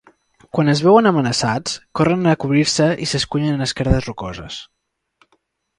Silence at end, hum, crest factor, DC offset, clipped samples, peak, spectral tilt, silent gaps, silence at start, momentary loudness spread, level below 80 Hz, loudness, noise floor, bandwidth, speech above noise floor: 1.15 s; none; 18 dB; under 0.1%; under 0.1%; 0 dBFS; -5 dB/octave; none; 0.55 s; 16 LU; -36 dBFS; -17 LUFS; -65 dBFS; 11.5 kHz; 48 dB